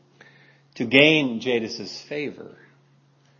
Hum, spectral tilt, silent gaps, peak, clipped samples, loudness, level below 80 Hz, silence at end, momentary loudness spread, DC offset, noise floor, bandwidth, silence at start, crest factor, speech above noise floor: none; -5 dB/octave; none; 0 dBFS; under 0.1%; -21 LUFS; -72 dBFS; 0.9 s; 18 LU; under 0.1%; -59 dBFS; 7.6 kHz; 0.75 s; 24 dB; 37 dB